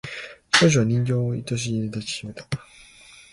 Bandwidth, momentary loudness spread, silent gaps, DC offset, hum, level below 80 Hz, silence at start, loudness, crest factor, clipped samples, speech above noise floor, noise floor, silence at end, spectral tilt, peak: 11.5 kHz; 16 LU; none; under 0.1%; none; -54 dBFS; 0.05 s; -23 LUFS; 22 dB; under 0.1%; 26 dB; -49 dBFS; 0.15 s; -4.5 dB/octave; -2 dBFS